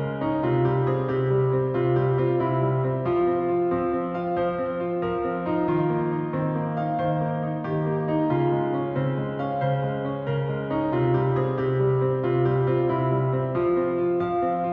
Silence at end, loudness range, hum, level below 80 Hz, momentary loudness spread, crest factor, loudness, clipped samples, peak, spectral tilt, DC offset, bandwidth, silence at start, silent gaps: 0 s; 2 LU; none; -54 dBFS; 4 LU; 12 dB; -24 LUFS; under 0.1%; -12 dBFS; -11.5 dB/octave; under 0.1%; 4.3 kHz; 0 s; none